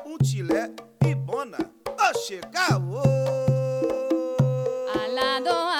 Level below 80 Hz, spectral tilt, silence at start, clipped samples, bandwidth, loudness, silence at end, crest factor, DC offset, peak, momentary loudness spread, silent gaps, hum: -54 dBFS; -6 dB/octave; 0 s; under 0.1%; 15.5 kHz; -25 LUFS; 0 s; 18 dB; under 0.1%; -8 dBFS; 7 LU; none; none